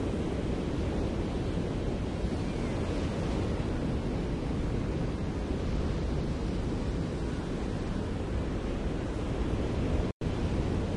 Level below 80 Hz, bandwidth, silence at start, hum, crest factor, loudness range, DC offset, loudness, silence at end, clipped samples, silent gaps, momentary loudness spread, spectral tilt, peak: -36 dBFS; 11 kHz; 0 s; none; 14 dB; 1 LU; under 0.1%; -33 LUFS; 0 s; under 0.1%; 10.12-10.20 s; 2 LU; -7.5 dB/octave; -16 dBFS